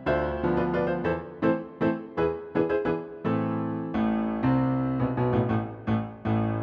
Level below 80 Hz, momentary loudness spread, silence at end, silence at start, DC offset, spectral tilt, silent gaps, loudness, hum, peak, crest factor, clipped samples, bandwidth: -46 dBFS; 5 LU; 0 s; 0 s; under 0.1%; -10 dB/octave; none; -27 LUFS; none; -10 dBFS; 16 dB; under 0.1%; 5.8 kHz